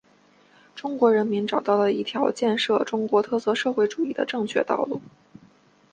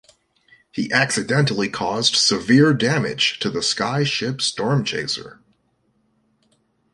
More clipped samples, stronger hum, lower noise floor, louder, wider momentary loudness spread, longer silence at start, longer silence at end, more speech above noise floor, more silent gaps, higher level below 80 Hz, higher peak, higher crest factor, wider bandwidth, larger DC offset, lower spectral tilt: neither; neither; second, -58 dBFS vs -66 dBFS; second, -23 LUFS vs -19 LUFS; about the same, 8 LU vs 8 LU; about the same, 0.75 s vs 0.75 s; second, 0.85 s vs 1.65 s; second, 35 dB vs 46 dB; neither; second, -70 dBFS vs -58 dBFS; second, -6 dBFS vs -2 dBFS; about the same, 18 dB vs 18 dB; second, 9.4 kHz vs 11.5 kHz; neither; about the same, -5 dB/octave vs -4 dB/octave